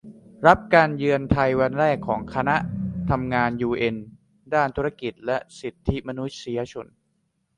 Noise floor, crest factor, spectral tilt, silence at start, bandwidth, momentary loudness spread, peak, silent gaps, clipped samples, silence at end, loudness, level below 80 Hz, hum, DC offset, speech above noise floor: -71 dBFS; 22 dB; -7 dB/octave; 0.05 s; 10.5 kHz; 13 LU; 0 dBFS; none; under 0.1%; 0.75 s; -23 LUFS; -44 dBFS; none; under 0.1%; 49 dB